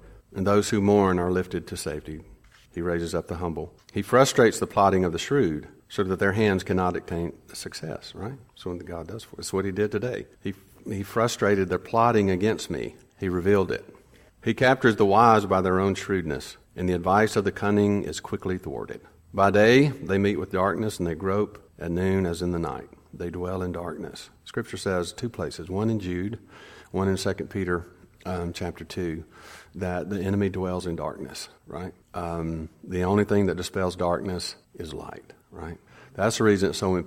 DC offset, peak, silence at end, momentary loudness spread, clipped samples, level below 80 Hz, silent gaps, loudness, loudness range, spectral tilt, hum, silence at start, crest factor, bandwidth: under 0.1%; -4 dBFS; 0 s; 17 LU; under 0.1%; -52 dBFS; none; -25 LUFS; 8 LU; -6 dB/octave; none; 0 s; 22 dB; 16.5 kHz